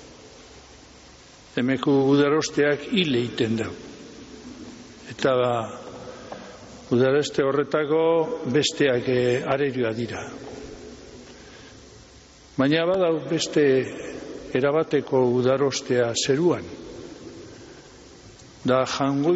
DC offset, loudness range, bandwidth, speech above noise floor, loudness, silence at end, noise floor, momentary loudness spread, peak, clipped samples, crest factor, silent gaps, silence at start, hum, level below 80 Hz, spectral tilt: under 0.1%; 6 LU; 8 kHz; 27 dB; -23 LUFS; 0 s; -49 dBFS; 21 LU; -8 dBFS; under 0.1%; 16 dB; none; 0 s; none; -56 dBFS; -4.5 dB/octave